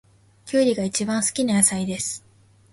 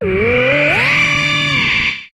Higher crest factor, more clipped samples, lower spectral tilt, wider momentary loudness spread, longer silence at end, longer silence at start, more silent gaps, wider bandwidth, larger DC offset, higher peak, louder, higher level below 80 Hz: first, 20 dB vs 12 dB; neither; about the same, -3.5 dB/octave vs -4 dB/octave; first, 10 LU vs 3 LU; first, 0.55 s vs 0.1 s; first, 0.45 s vs 0 s; neither; second, 12 kHz vs 14 kHz; neither; about the same, -4 dBFS vs -2 dBFS; second, -21 LUFS vs -12 LUFS; second, -60 dBFS vs -38 dBFS